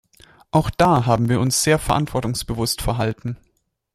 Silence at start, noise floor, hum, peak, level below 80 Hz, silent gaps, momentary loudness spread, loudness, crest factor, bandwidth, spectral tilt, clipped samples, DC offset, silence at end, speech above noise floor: 0.55 s; -51 dBFS; none; -2 dBFS; -38 dBFS; none; 8 LU; -20 LUFS; 18 dB; 15 kHz; -5 dB/octave; under 0.1%; under 0.1%; 0.6 s; 32 dB